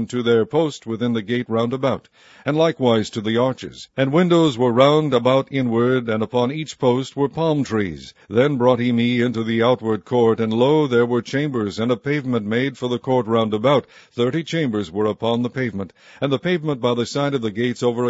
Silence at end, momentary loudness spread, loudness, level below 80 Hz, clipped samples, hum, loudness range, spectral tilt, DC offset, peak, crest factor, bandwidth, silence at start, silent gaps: 0 s; 7 LU; -20 LUFS; -58 dBFS; under 0.1%; none; 4 LU; -6.5 dB/octave; under 0.1%; 0 dBFS; 18 dB; 8 kHz; 0 s; none